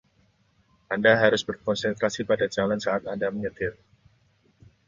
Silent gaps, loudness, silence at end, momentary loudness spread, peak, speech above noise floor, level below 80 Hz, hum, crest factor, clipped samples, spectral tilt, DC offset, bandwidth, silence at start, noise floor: none; -25 LUFS; 1.15 s; 11 LU; -4 dBFS; 40 dB; -58 dBFS; none; 22 dB; under 0.1%; -4.5 dB/octave; under 0.1%; 7.6 kHz; 0.9 s; -65 dBFS